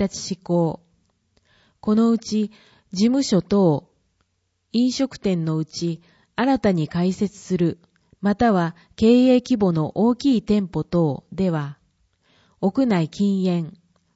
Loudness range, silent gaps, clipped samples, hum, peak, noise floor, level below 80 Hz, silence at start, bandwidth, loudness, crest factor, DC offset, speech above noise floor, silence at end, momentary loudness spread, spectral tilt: 4 LU; none; under 0.1%; none; -4 dBFS; -71 dBFS; -52 dBFS; 0 s; 8 kHz; -21 LUFS; 16 dB; under 0.1%; 51 dB; 0.45 s; 10 LU; -6.5 dB/octave